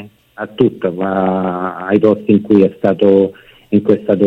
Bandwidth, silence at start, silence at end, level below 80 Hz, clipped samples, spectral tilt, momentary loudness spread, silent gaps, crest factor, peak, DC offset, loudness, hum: 4.7 kHz; 0 s; 0 s; -54 dBFS; under 0.1%; -9.5 dB/octave; 8 LU; none; 14 dB; 0 dBFS; under 0.1%; -14 LUFS; none